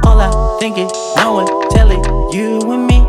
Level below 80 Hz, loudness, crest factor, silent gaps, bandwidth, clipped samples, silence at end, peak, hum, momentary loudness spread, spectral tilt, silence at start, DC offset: -12 dBFS; -13 LUFS; 10 dB; none; 11.5 kHz; under 0.1%; 0 s; 0 dBFS; none; 5 LU; -6 dB/octave; 0 s; under 0.1%